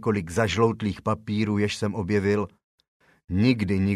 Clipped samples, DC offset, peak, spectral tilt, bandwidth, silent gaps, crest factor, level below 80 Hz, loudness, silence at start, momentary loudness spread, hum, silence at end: under 0.1%; under 0.1%; -8 dBFS; -6.5 dB/octave; 12.5 kHz; 2.64-2.78 s, 2.88-3.00 s; 18 dB; -52 dBFS; -25 LUFS; 0 s; 6 LU; none; 0 s